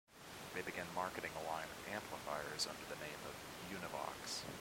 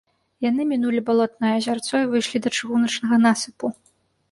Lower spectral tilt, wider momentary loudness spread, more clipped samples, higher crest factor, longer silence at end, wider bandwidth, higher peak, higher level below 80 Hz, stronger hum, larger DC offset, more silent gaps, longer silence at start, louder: second, -2.5 dB/octave vs -4 dB/octave; about the same, 7 LU vs 8 LU; neither; about the same, 20 dB vs 16 dB; second, 0 s vs 0.6 s; first, 16.5 kHz vs 11.5 kHz; second, -26 dBFS vs -6 dBFS; about the same, -70 dBFS vs -66 dBFS; neither; neither; neither; second, 0.1 s vs 0.4 s; second, -46 LUFS vs -22 LUFS